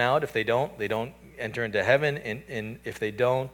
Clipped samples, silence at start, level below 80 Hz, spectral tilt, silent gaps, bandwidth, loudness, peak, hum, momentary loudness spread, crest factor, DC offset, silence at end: under 0.1%; 0 s; -58 dBFS; -5.5 dB/octave; none; 19 kHz; -28 LUFS; -8 dBFS; none; 12 LU; 20 dB; under 0.1%; 0 s